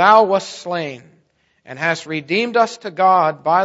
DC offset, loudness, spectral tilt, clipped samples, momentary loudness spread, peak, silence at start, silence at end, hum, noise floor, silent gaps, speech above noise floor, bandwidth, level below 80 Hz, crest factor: under 0.1%; -17 LUFS; -4.5 dB/octave; under 0.1%; 13 LU; 0 dBFS; 0 s; 0 s; none; -60 dBFS; none; 44 dB; 8 kHz; -68 dBFS; 18 dB